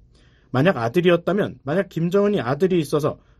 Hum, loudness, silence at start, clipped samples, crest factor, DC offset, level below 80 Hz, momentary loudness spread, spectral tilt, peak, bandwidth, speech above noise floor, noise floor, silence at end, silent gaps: none; -21 LUFS; 0.55 s; under 0.1%; 16 dB; under 0.1%; -54 dBFS; 6 LU; -7 dB/octave; -4 dBFS; 13.5 kHz; 34 dB; -54 dBFS; 0.25 s; none